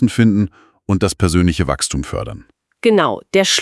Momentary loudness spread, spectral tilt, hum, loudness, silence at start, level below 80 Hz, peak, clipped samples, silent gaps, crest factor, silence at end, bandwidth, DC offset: 12 LU; -5 dB/octave; none; -16 LUFS; 0 s; -36 dBFS; 0 dBFS; under 0.1%; none; 16 dB; 0 s; 12 kHz; under 0.1%